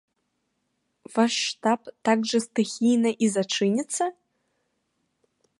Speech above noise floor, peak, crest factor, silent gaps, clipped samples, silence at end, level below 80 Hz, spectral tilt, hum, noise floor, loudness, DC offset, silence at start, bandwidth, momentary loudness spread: 52 dB; -6 dBFS; 20 dB; none; under 0.1%; 1.5 s; -76 dBFS; -4 dB/octave; none; -76 dBFS; -24 LUFS; under 0.1%; 1.1 s; 11.5 kHz; 6 LU